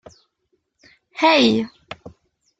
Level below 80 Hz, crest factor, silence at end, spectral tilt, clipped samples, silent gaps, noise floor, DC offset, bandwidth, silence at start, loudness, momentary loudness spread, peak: -60 dBFS; 20 dB; 0.5 s; -4.5 dB/octave; under 0.1%; none; -71 dBFS; under 0.1%; 9 kHz; 1.15 s; -17 LUFS; 24 LU; -2 dBFS